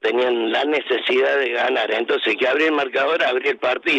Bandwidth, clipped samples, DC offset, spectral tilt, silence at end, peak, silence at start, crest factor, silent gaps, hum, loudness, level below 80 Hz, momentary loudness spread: 8.6 kHz; under 0.1%; under 0.1%; -3.5 dB/octave; 0 s; -8 dBFS; 0.05 s; 12 dB; none; none; -19 LUFS; -78 dBFS; 3 LU